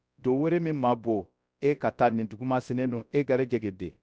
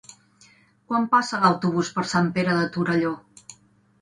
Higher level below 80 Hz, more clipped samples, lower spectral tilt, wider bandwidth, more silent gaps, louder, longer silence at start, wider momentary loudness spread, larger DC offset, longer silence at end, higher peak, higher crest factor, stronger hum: about the same, -60 dBFS vs -62 dBFS; neither; first, -8.5 dB/octave vs -5.5 dB/octave; second, 8 kHz vs 11 kHz; neither; second, -28 LUFS vs -22 LUFS; second, 0.25 s vs 0.9 s; about the same, 6 LU vs 6 LU; neither; second, 0.15 s vs 0.5 s; second, -12 dBFS vs -4 dBFS; about the same, 16 dB vs 20 dB; neither